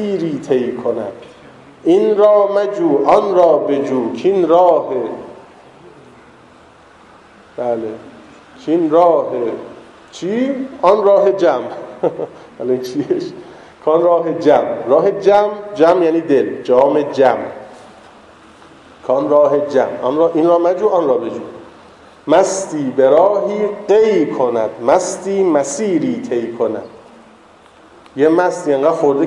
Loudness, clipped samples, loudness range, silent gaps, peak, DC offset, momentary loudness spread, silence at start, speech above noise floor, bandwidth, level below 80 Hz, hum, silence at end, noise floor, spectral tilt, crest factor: -14 LUFS; under 0.1%; 5 LU; none; 0 dBFS; under 0.1%; 15 LU; 0 s; 31 dB; 12 kHz; -60 dBFS; none; 0 s; -44 dBFS; -5.5 dB/octave; 14 dB